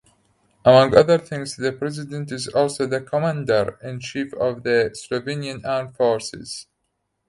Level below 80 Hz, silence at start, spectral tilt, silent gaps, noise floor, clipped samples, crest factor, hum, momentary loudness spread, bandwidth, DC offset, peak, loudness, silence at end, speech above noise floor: -54 dBFS; 0.65 s; -5.5 dB/octave; none; -74 dBFS; under 0.1%; 22 dB; none; 15 LU; 11.5 kHz; under 0.1%; 0 dBFS; -21 LUFS; 0.65 s; 54 dB